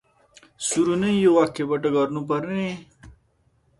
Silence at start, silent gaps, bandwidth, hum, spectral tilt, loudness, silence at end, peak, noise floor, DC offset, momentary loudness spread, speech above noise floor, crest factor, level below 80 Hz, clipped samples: 0.6 s; none; 11.5 kHz; none; -5 dB/octave; -22 LUFS; 0.7 s; -6 dBFS; -64 dBFS; under 0.1%; 11 LU; 43 dB; 18 dB; -58 dBFS; under 0.1%